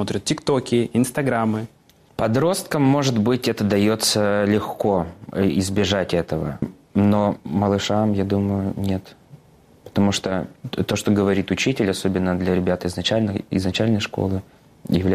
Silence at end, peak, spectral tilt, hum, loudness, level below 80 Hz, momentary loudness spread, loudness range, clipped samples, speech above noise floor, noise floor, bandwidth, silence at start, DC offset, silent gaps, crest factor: 0 s; -8 dBFS; -5.5 dB/octave; none; -21 LUFS; -50 dBFS; 8 LU; 3 LU; under 0.1%; 31 dB; -52 dBFS; 15.5 kHz; 0 s; under 0.1%; none; 14 dB